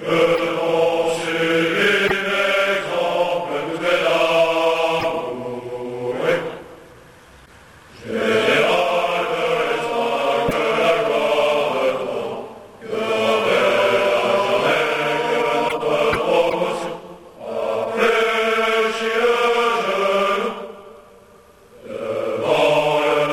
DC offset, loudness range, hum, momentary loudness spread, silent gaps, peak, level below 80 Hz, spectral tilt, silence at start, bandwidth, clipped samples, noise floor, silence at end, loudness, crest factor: under 0.1%; 4 LU; none; 11 LU; none; -6 dBFS; -54 dBFS; -4 dB/octave; 0 s; 15.5 kHz; under 0.1%; -48 dBFS; 0 s; -19 LUFS; 14 dB